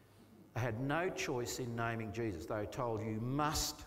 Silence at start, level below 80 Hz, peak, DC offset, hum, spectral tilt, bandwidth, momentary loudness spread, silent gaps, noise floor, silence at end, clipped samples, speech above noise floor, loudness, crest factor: 0 s; -58 dBFS; -22 dBFS; under 0.1%; none; -4.5 dB/octave; 16 kHz; 6 LU; none; -61 dBFS; 0 s; under 0.1%; 23 dB; -39 LUFS; 16 dB